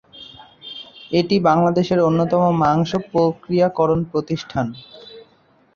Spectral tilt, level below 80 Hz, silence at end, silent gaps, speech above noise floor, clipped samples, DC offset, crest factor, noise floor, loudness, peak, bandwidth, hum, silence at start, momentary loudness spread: -7.5 dB/octave; -52 dBFS; 0.55 s; none; 39 dB; under 0.1%; under 0.1%; 16 dB; -56 dBFS; -18 LUFS; -4 dBFS; 7 kHz; none; 0.15 s; 22 LU